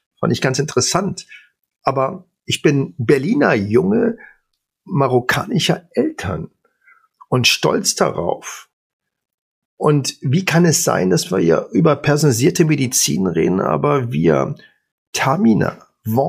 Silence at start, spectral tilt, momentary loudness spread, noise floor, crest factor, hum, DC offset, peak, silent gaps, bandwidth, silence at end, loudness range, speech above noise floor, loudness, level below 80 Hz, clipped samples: 0.2 s; -4.5 dB/octave; 11 LU; -69 dBFS; 16 dB; none; under 0.1%; 0 dBFS; 8.73-9.00 s, 9.34-9.77 s, 14.92-15.13 s; 15.5 kHz; 0 s; 4 LU; 53 dB; -17 LUFS; -52 dBFS; under 0.1%